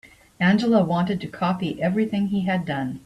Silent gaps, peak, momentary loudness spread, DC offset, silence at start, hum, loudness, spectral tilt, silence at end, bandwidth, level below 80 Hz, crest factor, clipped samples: none; -8 dBFS; 6 LU; under 0.1%; 0.05 s; none; -22 LUFS; -7.5 dB/octave; 0.05 s; 11 kHz; -58 dBFS; 16 dB; under 0.1%